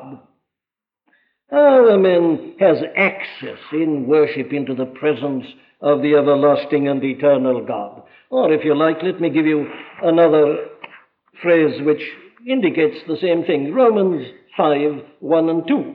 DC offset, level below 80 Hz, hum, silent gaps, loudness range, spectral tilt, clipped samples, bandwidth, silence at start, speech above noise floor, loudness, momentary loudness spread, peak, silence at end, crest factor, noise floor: under 0.1%; -74 dBFS; none; none; 3 LU; -10 dB/octave; under 0.1%; 5 kHz; 0 s; 72 dB; -17 LUFS; 13 LU; -2 dBFS; 0 s; 14 dB; -88 dBFS